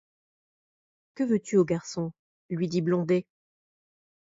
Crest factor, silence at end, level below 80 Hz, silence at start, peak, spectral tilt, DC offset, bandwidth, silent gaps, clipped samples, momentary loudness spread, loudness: 18 dB; 1.1 s; -68 dBFS; 1.15 s; -12 dBFS; -7 dB/octave; under 0.1%; 7.8 kHz; 2.19-2.49 s; under 0.1%; 10 LU; -28 LUFS